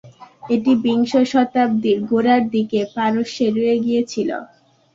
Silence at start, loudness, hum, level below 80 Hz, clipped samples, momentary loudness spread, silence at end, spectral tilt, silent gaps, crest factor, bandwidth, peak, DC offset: 0.05 s; -18 LUFS; none; -60 dBFS; under 0.1%; 6 LU; 0.5 s; -6 dB/octave; none; 16 dB; 7.6 kHz; -2 dBFS; under 0.1%